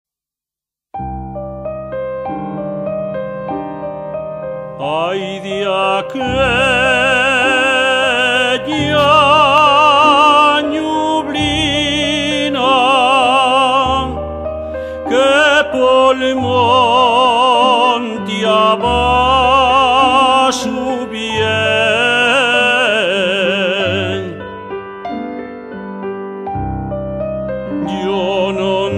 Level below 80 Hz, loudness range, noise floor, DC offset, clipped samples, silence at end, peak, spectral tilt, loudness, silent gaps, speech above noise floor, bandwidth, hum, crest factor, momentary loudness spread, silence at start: -36 dBFS; 12 LU; -87 dBFS; under 0.1%; under 0.1%; 0 s; 0 dBFS; -4 dB/octave; -13 LUFS; none; 74 dB; 12.5 kHz; none; 14 dB; 15 LU; 0.95 s